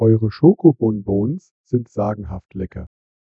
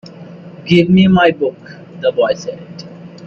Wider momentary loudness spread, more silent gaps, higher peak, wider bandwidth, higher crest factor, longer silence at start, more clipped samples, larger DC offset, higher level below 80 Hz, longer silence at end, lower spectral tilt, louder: second, 17 LU vs 25 LU; first, 1.51-1.64 s vs none; about the same, 0 dBFS vs 0 dBFS; about the same, 6.6 kHz vs 7 kHz; about the same, 18 dB vs 14 dB; about the same, 0 s vs 0.05 s; neither; neither; about the same, -44 dBFS vs -48 dBFS; first, 0.45 s vs 0 s; first, -11 dB/octave vs -7 dB/octave; second, -18 LUFS vs -13 LUFS